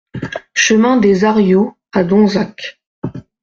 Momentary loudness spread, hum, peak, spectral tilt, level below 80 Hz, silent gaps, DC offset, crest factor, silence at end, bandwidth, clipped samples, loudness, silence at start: 17 LU; none; 0 dBFS; -5 dB/octave; -50 dBFS; 2.87-3.02 s; under 0.1%; 14 dB; 0.25 s; 7.6 kHz; under 0.1%; -13 LUFS; 0.15 s